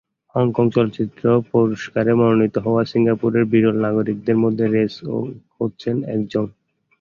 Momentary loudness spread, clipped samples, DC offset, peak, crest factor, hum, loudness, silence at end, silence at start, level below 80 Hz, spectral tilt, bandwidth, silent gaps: 10 LU; under 0.1%; under 0.1%; -2 dBFS; 16 dB; none; -19 LUFS; 0.5 s; 0.35 s; -56 dBFS; -9 dB/octave; 7 kHz; none